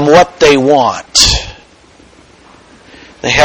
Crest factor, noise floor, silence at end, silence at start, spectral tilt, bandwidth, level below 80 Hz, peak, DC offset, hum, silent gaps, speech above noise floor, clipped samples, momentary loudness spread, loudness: 12 dB; -42 dBFS; 0 s; 0 s; -3 dB/octave; over 20 kHz; -30 dBFS; 0 dBFS; under 0.1%; none; none; 34 dB; 0.8%; 11 LU; -9 LUFS